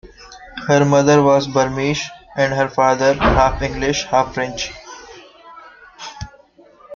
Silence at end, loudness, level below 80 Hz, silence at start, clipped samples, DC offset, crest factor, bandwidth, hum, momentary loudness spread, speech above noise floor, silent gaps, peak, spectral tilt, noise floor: 0 s; -16 LUFS; -34 dBFS; 0.05 s; under 0.1%; under 0.1%; 16 dB; 7.4 kHz; none; 22 LU; 32 dB; none; -2 dBFS; -5 dB/octave; -48 dBFS